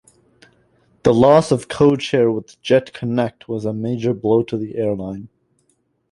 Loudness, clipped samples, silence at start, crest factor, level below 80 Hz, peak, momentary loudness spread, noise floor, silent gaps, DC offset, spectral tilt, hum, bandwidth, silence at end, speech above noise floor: -18 LUFS; under 0.1%; 1.05 s; 18 dB; -52 dBFS; 0 dBFS; 12 LU; -65 dBFS; none; under 0.1%; -7 dB/octave; none; 11.5 kHz; 0.85 s; 48 dB